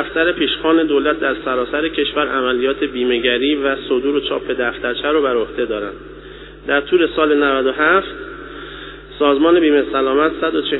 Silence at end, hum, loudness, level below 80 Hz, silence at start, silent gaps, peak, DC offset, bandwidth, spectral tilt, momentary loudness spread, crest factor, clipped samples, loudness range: 0 s; none; -16 LUFS; -44 dBFS; 0 s; none; 0 dBFS; under 0.1%; 4.1 kHz; -1.5 dB/octave; 17 LU; 16 dB; under 0.1%; 3 LU